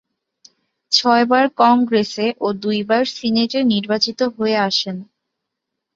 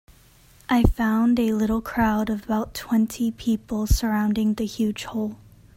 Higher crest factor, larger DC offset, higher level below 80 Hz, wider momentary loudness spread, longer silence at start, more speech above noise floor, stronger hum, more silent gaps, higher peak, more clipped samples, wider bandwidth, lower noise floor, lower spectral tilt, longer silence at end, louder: about the same, 18 dB vs 20 dB; neither; second, -64 dBFS vs -32 dBFS; about the same, 7 LU vs 7 LU; first, 0.9 s vs 0.7 s; first, 62 dB vs 31 dB; neither; neither; about the same, -2 dBFS vs -4 dBFS; neither; second, 7.6 kHz vs 16.5 kHz; first, -79 dBFS vs -53 dBFS; second, -4.5 dB/octave vs -6 dB/octave; first, 0.9 s vs 0.4 s; first, -17 LUFS vs -23 LUFS